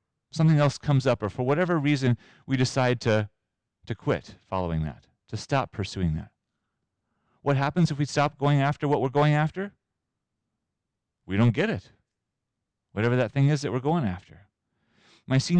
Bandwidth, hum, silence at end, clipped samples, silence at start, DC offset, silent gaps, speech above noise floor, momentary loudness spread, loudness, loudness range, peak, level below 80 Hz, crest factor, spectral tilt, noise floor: 9.4 kHz; none; 0 s; under 0.1%; 0.35 s; under 0.1%; none; 59 dB; 12 LU; -26 LUFS; 6 LU; -14 dBFS; -52 dBFS; 12 dB; -7 dB/octave; -84 dBFS